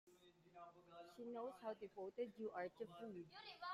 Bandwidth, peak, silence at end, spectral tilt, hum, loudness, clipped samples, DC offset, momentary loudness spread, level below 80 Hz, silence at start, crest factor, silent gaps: 15 kHz; -36 dBFS; 0 s; -5.5 dB/octave; none; -53 LUFS; under 0.1%; under 0.1%; 13 LU; -90 dBFS; 0.05 s; 18 dB; none